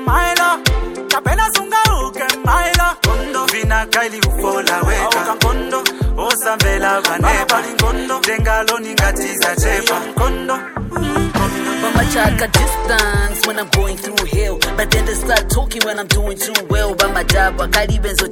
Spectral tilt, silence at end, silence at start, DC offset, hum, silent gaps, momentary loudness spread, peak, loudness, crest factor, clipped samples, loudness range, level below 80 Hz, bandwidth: -3.5 dB/octave; 0 s; 0 s; under 0.1%; none; none; 4 LU; 0 dBFS; -15 LUFS; 16 dB; under 0.1%; 2 LU; -22 dBFS; 17.5 kHz